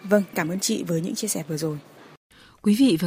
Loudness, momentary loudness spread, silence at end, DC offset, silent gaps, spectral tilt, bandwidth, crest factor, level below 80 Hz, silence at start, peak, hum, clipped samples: -24 LUFS; 9 LU; 0 s; under 0.1%; 2.17-2.30 s; -4.5 dB/octave; 16 kHz; 20 dB; -64 dBFS; 0 s; -4 dBFS; none; under 0.1%